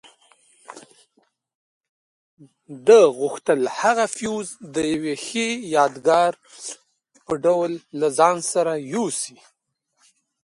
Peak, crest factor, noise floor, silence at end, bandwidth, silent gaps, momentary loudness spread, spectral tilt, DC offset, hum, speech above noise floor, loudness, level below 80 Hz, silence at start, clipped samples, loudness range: -2 dBFS; 20 dB; -73 dBFS; 1.15 s; 11.5 kHz; 1.55-1.81 s, 1.89-2.37 s; 14 LU; -3.5 dB/octave; under 0.1%; none; 52 dB; -20 LUFS; -66 dBFS; 0.7 s; under 0.1%; 3 LU